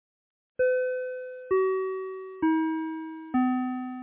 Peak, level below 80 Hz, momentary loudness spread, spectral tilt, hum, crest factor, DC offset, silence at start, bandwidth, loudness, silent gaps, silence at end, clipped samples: -16 dBFS; -68 dBFS; 11 LU; -9.5 dB/octave; none; 14 dB; under 0.1%; 0.6 s; 3.8 kHz; -29 LUFS; none; 0 s; under 0.1%